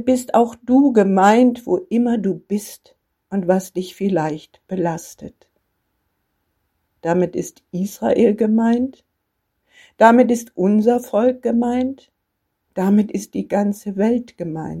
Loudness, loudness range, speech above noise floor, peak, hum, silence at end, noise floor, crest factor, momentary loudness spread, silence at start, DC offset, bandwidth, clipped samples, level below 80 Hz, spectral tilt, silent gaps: -18 LUFS; 9 LU; 56 dB; 0 dBFS; none; 0 s; -74 dBFS; 18 dB; 15 LU; 0 s; under 0.1%; 15.5 kHz; under 0.1%; -58 dBFS; -7 dB/octave; none